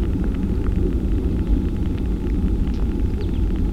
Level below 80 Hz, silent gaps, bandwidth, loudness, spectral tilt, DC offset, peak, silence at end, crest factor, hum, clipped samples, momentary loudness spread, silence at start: -22 dBFS; none; 6 kHz; -23 LUFS; -9 dB/octave; 0.5%; -6 dBFS; 0 s; 14 dB; none; under 0.1%; 2 LU; 0 s